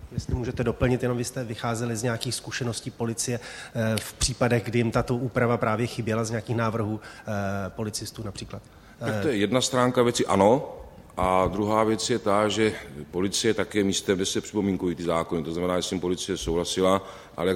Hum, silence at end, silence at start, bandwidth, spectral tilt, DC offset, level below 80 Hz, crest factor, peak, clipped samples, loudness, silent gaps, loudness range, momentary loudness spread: none; 0 s; 0 s; 16 kHz; -5 dB/octave; under 0.1%; -46 dBFS; 20 dB; -6 dBFS; under 0.1%; -26 LUFS; none; 5 LU; 10 LU